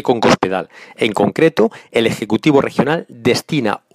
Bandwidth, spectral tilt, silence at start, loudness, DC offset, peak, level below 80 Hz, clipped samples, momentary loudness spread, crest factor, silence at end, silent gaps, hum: 15.5 kHz; -5.5 dB/octave; 0.05 s; -16 LUFS; under 0.1%; 0 dBFS; -52 dBFS; under 0.1%; 6 LU; 16 dB; 0.15 s; none; none